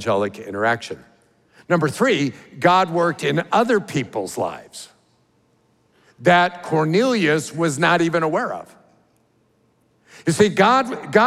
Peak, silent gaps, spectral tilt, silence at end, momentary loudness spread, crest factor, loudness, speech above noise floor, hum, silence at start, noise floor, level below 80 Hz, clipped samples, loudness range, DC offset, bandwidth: -2 dBFS; none; -5 dB/octave; 0 s; 11 LU; 20 dB; -19 LUFS; 43 dB; none; 0 s; -62 dBFS; -64 dBFS; under 0.1%; 4 LU; under 0.1%; 15 kHz